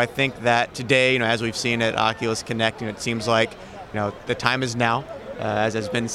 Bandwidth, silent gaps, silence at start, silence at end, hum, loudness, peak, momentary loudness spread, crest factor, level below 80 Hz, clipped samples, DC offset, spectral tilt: 15 kHz; none; 0 s; 0 s; none; -22 LUFS; -2 dBFS; 9 LU; 22 dB; -52 dBFS; under 0.1%; under 0.1%; -4 dB/octave